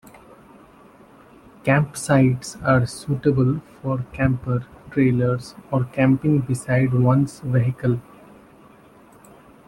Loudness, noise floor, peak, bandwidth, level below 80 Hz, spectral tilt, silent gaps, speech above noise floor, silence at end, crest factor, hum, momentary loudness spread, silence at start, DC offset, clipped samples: -21 LUFS; -49 dBFS; -4 dBFS; 12.5 kHz; -48 dBFS; -7.5 dB/octave; none; 29 dB; 1.65 s; 18 dB; none; 9 LU; 1.65 s; under 0.1%; under 0.1%